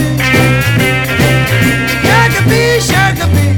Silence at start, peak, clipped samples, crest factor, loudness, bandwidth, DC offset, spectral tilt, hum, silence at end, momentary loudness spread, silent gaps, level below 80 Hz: 0 s; 0 dBFS; under 0.1%; 10 dB; -9 LUFS; 19.5 kHz; 0.2%; -5 dB/octave; none; 0 s; 3 LU; none; -26 dBFS